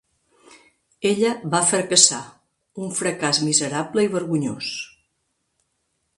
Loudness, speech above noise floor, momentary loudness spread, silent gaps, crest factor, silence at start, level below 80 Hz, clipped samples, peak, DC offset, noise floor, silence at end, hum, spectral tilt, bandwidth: -20 LUFS; 52 dB; 18 LU; none; 24 dB; 0.5 s; -66 dBFS; under 0.1%; 0 dBFS; under 0.1%; -73 dBFS; 1.3 s; none; -2.5 dB/octave; 11.5 kHz